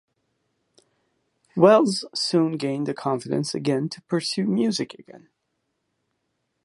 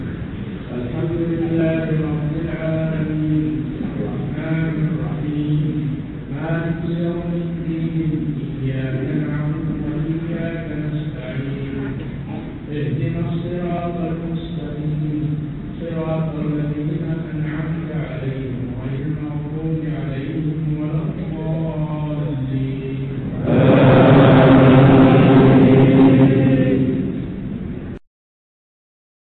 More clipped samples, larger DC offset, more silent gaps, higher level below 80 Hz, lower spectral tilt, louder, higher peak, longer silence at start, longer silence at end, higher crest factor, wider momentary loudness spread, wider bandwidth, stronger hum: neither; neither; neither; second, -72 dBFS vs -38 dBFS; second, -5.5 dB/octave vs -11 dB/octave; second, -22 LUFS vs -19 LUFS; about the same, -2 dBFS vs -4 dBFS; first, 1.55 s vs 0 s; first, 1.5 s vs 1.25 s; first, 22 dB vs 14 dB; second, 11 LU vs 16 LU; first, 11.5 kHz vs 4.3 kHz; neither